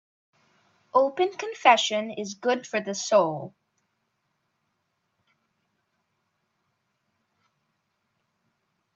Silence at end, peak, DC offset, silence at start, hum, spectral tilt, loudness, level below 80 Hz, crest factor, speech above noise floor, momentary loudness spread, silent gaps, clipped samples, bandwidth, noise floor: 5.45 s; -4 dBFS; under 0.1%; 0.95 s; none; -3 dB/octave; -24 LUFS; -82 dBFS; 26 dB; 53 dB; 11 LU; none; under 0.1%; 8.2 kHz; -77 dBFS